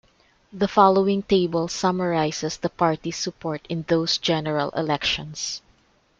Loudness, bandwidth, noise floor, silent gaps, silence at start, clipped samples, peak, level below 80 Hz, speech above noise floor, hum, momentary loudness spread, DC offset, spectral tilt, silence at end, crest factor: -23 LUFS; 8.8 kHz; -61 dBFS; none; 0.55 s; under 0.1%; -2 dBFS; -54 dBFS; 38 dB; none; 11 LU; under 0.1%; -4.5 dB/octave; 0.6 s; 20 dB